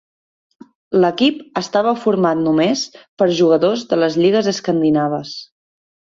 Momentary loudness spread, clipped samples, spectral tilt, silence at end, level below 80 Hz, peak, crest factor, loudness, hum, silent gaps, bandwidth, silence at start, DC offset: 9 LU; under 0.1%; -5.5 dB/octave; 0.7 s; -60 dBFS; -2 dBFS; 14 dB; -16 LUFS; none; 3.08-3.17 s; 7.6 kHz; 0.9 s; under 0.1%